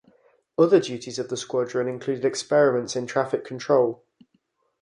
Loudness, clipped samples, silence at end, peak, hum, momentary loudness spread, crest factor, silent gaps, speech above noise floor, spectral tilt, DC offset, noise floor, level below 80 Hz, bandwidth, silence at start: -24 LUFS; under 0.1%; 0.85 s; -6 dBFS; none; 11 LU; 20 dB; none; 47 dB; -5 dB/octave; under 0.1%; -69 dBFS; -72 dBFS; 11 kHz; 0.6 s